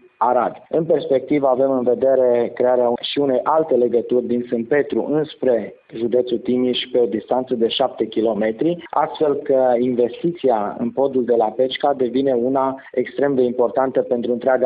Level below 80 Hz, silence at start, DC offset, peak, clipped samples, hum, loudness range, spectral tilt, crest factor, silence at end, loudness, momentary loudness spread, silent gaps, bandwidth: -62 dBFS; 0.2 s; under 0.1%; -2 dBFS; under 0.1%; none; 3 LU; -10 dB/octave; 16 dB; 0 s; -19 LUFS; 5 LU; none; 5 kHz